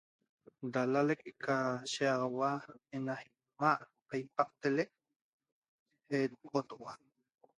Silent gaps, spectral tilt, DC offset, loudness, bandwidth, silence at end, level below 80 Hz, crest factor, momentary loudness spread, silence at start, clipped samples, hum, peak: 5.16-5.39 s, 5.52-5.62 s, 5.68-5.86 s; -5.5 dB/octave; under 0.1%; -36 LUFS; 11 kHz; 0.65 s; -82 dBFS; 22 dB; 13 LU; 0.6 s; under 0.1%; none; -14 dBFS